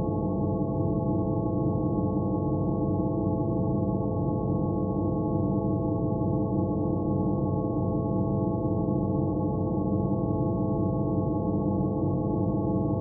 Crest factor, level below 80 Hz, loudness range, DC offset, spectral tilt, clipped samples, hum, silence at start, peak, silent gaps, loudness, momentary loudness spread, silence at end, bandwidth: 12 dB; -42 dBFS; 0 LU; under 0.1%; -6.5 dB/octave; under 0.1%; none; 0 s; -14 dBFS; none; -27 LUFS; 1 LU; 0 s; 1.2 kHz